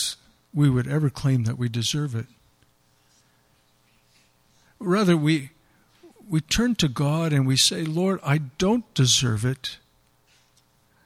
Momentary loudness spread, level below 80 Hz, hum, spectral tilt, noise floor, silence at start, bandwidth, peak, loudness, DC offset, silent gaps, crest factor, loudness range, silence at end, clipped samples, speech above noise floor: 14 LU; -50 dBFS; none; -4.5 dB/octave; -63 dBFS; 0 s; 15 kHz; -6 dBFS; -23 LUFS; under 0.1%; none; 20 dB; 8 LU; 1.3 s; under 0.1%; 40 dB